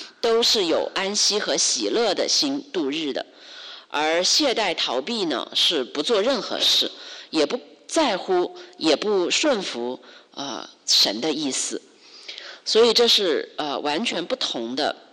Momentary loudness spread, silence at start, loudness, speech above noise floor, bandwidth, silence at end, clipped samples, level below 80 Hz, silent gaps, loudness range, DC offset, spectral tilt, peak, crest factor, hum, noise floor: 15 LU; 0 s; -21 LUFS; 20 dB; 14 kHz; 0.15 s; under 0.1%; -66 dBFS; none; 3 LU; under 0.1%; -1.5 dB/octave; -10 dBFS; 14 dB; none; -42 dBFS